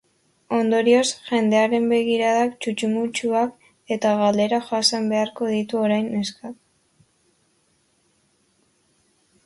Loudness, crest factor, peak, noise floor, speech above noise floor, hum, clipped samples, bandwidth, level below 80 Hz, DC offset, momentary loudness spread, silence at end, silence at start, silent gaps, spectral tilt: -21 LUFS; 18 dB; -4 dBFS; -65 dBFS; 44 dB; none; under 0.1%; 11.5 kHz; -68 dBFS; under 0.1%; 8 LU; 2.95 s; 0.5 s; none; -4 dB/octave